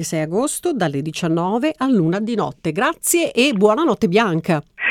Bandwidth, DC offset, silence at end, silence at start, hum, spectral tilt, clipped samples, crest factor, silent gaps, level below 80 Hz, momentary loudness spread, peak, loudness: 18.5 kHz; under 0.1%; 0 s; 0 s; none; -4.5 dB/octave; under 0.1%; 16 dB; none; -56 dBFS; 6 LU; -2 dBFS; -18 LUFS